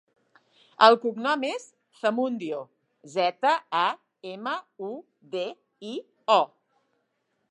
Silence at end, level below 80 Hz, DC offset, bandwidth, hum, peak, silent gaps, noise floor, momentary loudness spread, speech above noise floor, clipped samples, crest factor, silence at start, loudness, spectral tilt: 1.05 s; -88 dBFS; under 0.1%; 10.5 kHz; none; -2 dBFS; none; -75 dBFS; 18 LU; 50 dB; under 0.1%; 24 dB; 0.8 s; -25 LUFS; -4 dB/octave